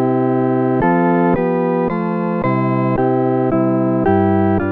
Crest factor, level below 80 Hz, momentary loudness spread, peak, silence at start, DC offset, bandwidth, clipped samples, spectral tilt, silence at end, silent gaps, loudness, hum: 12 dB; -42 dBFS; 4 LU; -4 dBFS; 0 s; under 0.1%; 4.3 kHz; under 0.1%; -11.5 dB/octave; 0 s; none; -16 LUFS; none